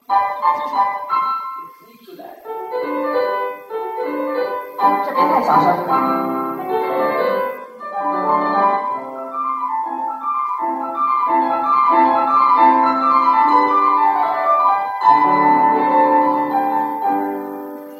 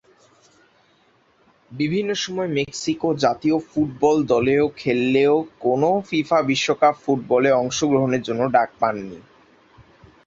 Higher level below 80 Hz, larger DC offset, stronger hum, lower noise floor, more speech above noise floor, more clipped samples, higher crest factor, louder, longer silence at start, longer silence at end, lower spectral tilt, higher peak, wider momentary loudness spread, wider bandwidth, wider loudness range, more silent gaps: second, -68 dBFS vs -58 dBFS; neither; neither; second, -41 dBFS vs -59 dBFS; second, 24 dB vs 39 dB; neither; about the same, 16 dB vs 18 dB; first, -17 LUFS vs -20 LUFS; second, 0.1 s vs 1.7 s; second, 0 s vs 1.05 s; first, -6.5 dB/octave vs -5 dB/octave; about the same, 0 dBFS vs -2 dBFS; first, 12 LU vs 6 LU; first, 15.5 kHz vs 7.8 kHz; first, 8 LU vs 5 LU; neither